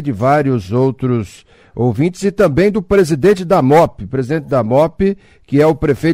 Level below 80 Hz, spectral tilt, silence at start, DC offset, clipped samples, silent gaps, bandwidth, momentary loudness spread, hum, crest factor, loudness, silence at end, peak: -38 dBFS; -7.5 dB/octave; 0 s; under 0.1%; under 0.1%; none; 16 kHz; 7 LU; none; 12 dB; -14 LUFS; 0 s; -2 dBFS